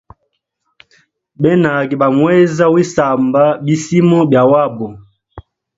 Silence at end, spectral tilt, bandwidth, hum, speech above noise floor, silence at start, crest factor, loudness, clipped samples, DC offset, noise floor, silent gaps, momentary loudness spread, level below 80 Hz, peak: 0.4 s; -7 dB/octave; 7.8 kHz; none; 57 dB; 1.4 s; 14 dB; -12 LUFS; under 0.1%; under 0.1%; -68 dBFS; none; 7 LU; -50 dBFS; 0 dBFS